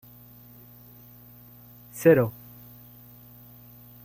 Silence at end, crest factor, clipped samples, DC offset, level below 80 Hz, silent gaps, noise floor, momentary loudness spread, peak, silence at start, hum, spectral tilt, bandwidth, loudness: 1.75 s; 24 dB; under 0.1%; under 0.1%; -62 dBFS; none; -50 dBFS; 28 LU; -6 dBFS; 1.95 s; 60 Hz at -45 dBFS; -7.5 dB/octave; 16.5 kHz; -22 LUFS